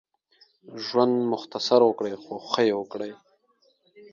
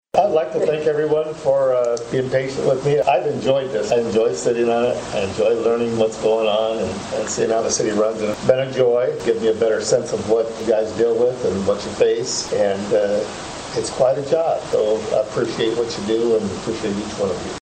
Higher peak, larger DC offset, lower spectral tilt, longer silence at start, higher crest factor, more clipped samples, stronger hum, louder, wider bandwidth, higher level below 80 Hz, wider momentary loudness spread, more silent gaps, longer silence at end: second, -6 dBFS vs -2 dBFS; neither; about the same, -5 dB/octave vs -4.5 dB/octave; first, 0.7 s vs 0.15 s; about the same, 20 dB vs 18 dB; neither; neither; second, -24 LUFS vs -19 LUFS; second, 7.4 kHz vs 9.4 kHz; second, -76 dBFS vs -52 dBFS; first, 16 LU vs 6 LU; neither; about the same, 0.1 s vs 0 s